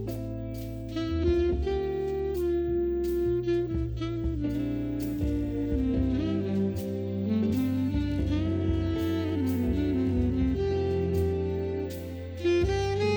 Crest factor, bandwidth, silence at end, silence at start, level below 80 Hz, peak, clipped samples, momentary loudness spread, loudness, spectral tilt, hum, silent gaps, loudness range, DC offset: 14 dB; over 20 kHz; 0 s; 0 s; -38 dBFS; -14 dBFS; under 0.1%; 6 LU; -29 LUFS; -8 dB/octave; none; none; 2 LU; under 0.1%